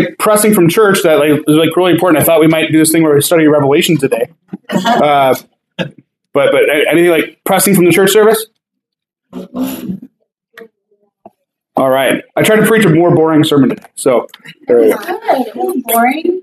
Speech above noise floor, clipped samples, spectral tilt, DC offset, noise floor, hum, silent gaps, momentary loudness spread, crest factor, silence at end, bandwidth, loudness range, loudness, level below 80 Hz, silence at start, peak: 67 dB; under 0.1%; -4.5 dB/octave; under 0.1%; -77 dBFS; none; none; 14 LU; 10 dB; 0 s; 15.5 kHz; 8 LU; -10 LUFS; -56 dBFS; 0 s; 0 dBFS